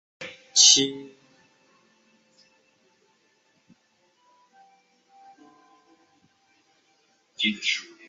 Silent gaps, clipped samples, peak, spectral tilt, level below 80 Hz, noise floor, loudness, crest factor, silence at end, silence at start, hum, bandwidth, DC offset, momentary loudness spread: none; under 0.1%; -2 dBFS; 0.5 dB/octave; -76 dBFS; -67 dBFS; -19 LUFS; 28 dB; 0.25 s; 0.2 s; none; 8.8 kHz; under 0.1%; 27 LU